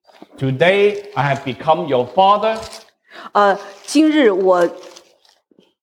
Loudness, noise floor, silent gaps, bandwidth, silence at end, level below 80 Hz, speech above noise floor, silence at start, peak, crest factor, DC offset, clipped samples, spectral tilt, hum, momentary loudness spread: -16 LUFS; -56 dBFS; none; 13 kHz; 0.95 s; -58 dBFS; 41 dB; 0.4 s; -2 dBFS; 16 dB; under 0.1%; under 0.1%; -5.5 dB/octave; none; 11 LU